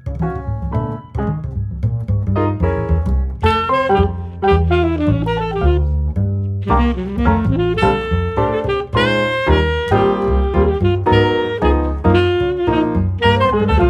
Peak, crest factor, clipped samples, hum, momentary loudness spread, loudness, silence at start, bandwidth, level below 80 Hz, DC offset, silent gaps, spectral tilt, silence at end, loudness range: 0 dBFS; 16 dB; under 0.1%; none; 8 LU; -17 LUFS; 0.05 s; 8.8 kHz; -24 dBFS; under 0.1%; none; -8 dB/octave; 0 s; 3 LU